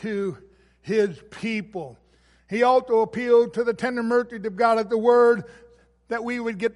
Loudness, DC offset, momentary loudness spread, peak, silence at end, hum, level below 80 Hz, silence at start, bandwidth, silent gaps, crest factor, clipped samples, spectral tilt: -22 LUFS; under 0.1%; 13 LU; -6 dBFS; 0.05 s; 60 Hz at -60 dBFS; -62 dBFS; 0 s; 11 kHz; none; 18 dB; under 0.1%; -6 dB/octave